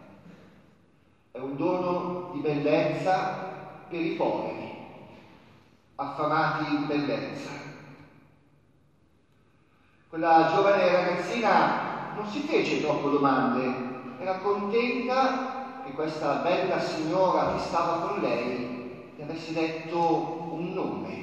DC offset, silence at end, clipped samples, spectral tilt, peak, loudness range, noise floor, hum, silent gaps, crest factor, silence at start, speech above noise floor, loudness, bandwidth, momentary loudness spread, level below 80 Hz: under 0.1%; 0 s; under 0.1%; -6 dB/octave; -8 dBFS; 7 LU; -64 dBFS; none; none; 20 dB; 0 s; 38 dB; -27 LUFS; 9.2 kHz; 16 LU; -66 dBFS